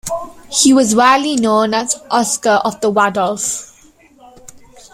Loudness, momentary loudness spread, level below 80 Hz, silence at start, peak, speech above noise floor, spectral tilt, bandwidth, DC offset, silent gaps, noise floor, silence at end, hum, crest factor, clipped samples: -14 LUFS; 9 LU; -52 dBFS; 0.05 s; 0 dBFS; 34 dB; -2.5 dB/octave; 16.5 kHz; under 0.1%; none; -47 dBFS; 0.35 s; none; 14 dB; under 0.1%